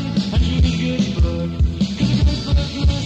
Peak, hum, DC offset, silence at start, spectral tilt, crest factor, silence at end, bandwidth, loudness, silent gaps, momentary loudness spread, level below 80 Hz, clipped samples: -4 dBFS; none; under 0.1%; 0 s; -6.5 dB/octave; 14 dB; 0 s; 8.4 kHz; -19 LUFS; none; 3 LU; -20 dBFS; under 0.1%